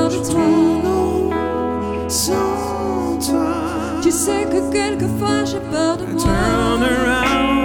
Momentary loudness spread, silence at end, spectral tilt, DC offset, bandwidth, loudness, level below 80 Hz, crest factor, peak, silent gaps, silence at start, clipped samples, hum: 6 LU; 0 s; -4.5 dB/octave; under 0.1%; 18 kHz; -18 LUFS; -34 dBFS; 14 dB; -4 dBFS; none; 0 s; under 0.1%; none